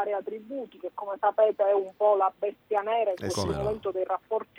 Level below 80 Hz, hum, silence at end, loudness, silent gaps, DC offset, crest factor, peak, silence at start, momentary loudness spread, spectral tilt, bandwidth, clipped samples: -56 dBFS; none; 0.15 s; -28 LUFS; none; under 0.1%; 16 dB; -12 dBFS; 0 s; 13 LU; -5.5 dB/octave; 14 kHz; under 0.1%